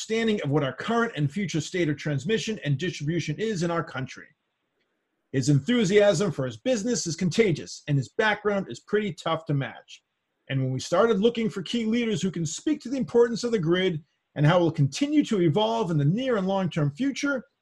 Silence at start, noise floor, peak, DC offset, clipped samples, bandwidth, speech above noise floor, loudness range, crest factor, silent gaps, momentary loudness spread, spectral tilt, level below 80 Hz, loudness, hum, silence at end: 0 s; -76 dBFS; -8 dBFS; under 0.1%; under 0.1%; 11.5 kHz; 51 dB; 4 LU; 18 dB; none; 7 LU; -5.5 dB/octave; -60 dBFS; -25 LUFS; none; 0.2 s